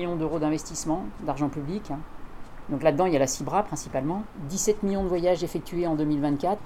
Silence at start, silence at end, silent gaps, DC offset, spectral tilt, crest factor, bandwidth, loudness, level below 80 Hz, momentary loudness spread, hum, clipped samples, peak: 0 s; 0 s; none; under 0.1%; -5.5 dB/octave; 18 dB; 16 kHz; -27 LUFS; -44 dBFS; 11 LU; none; under 0.1%; -8 dBFS